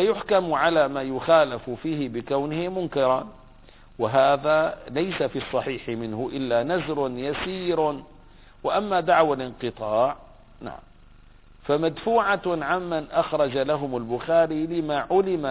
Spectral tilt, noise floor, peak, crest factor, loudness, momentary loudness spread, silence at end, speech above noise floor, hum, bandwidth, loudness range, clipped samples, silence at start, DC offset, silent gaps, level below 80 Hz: -9.5 dB/octave; -50 dBFS; -6 dBFS; 18 dB; -24 LUFS; 10 LU; 0 s; 26 dB; none; 4 kHz; 3 LU; under 0.1%; 0 s; under 0.1%; none; -52 dBFS